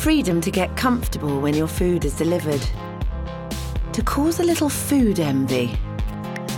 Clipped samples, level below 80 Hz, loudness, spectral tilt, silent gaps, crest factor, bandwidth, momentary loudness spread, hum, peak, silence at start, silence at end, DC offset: under 0.1%; -30 dBFS; -22 LUFS; -5.5 dB/octave; none; 14 dB; 17.5 kHz; 10 LU; none; -8 dBFS; 0 s; 0 s; under 0.1%